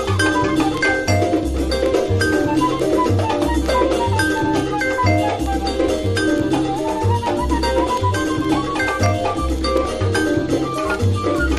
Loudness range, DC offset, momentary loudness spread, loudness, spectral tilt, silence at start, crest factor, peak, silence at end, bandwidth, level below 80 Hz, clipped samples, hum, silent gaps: 1 LU; under 0.1%; 3 LU; -18 LUFS; -5.5 dB/octave; 0 s; 14 dB; -4 dBFS; 0 s; 13.5 kHz; -30 dBFS; under 0.1%; none; none